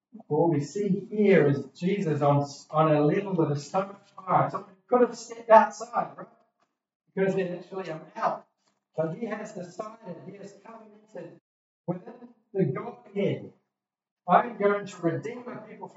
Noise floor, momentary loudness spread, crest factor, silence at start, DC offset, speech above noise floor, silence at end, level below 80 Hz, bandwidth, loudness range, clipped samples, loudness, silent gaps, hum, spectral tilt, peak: -85 dBFS; 20 LU; 24 dB; 0.15 s; under 0.1%; 59 dB; 0.1 s; -82 dBFS; 8 kHz; 13 LU; under 0.1%; -26 LUFS; 6.95-7.00 s, 11.41-11.84 s, 14.11-14.16 s; none; -7.5 dB/octave; -4 dBFS